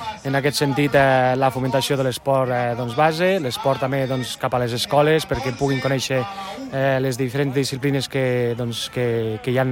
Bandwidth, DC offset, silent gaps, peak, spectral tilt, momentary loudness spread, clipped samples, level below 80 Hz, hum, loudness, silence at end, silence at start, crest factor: 16.5 kHz; under 0.1%; none; -4 dBFS; -5.5 dB/octave; 7 LU; under 0.1%; -50 dBFS; none; -21 LUFS; 0 s; 0 s; 16 dB